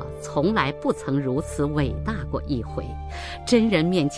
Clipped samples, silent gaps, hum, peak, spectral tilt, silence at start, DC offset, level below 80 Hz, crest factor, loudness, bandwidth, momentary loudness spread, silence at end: under 0.1%; none; none; -6 dBFS; -6 dB/octave; 0 s; under 0.1%; -36 dBFS; 18 dB; -24 LUFS; 11 kHz; 12 LU; 0 s